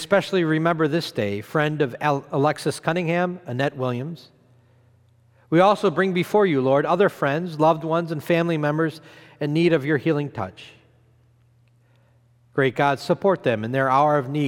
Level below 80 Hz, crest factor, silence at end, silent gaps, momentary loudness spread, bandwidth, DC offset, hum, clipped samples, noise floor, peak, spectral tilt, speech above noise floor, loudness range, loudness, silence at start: -68 dBFS; 18 dB; 0 s; none; 8 LU; 17 kHz; under 0.1%; none; under 0.1%; -58 dBFS; -4 dBFS; -6.5 dB/octave; 37 dB; 6 LU; -22 LUFS; 0 s